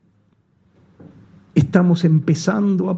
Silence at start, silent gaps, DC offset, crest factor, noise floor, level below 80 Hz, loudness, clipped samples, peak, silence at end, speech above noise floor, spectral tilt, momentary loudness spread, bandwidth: 1.55 s; none; under 0.1%; 18 dB; -60 dBFS; -54 dBFS; -17 LUFS; under 0.1%; 0 dBFS; 0 s; 44 dB; -7.5 dB/octave; 4 LU; 7.8 kHz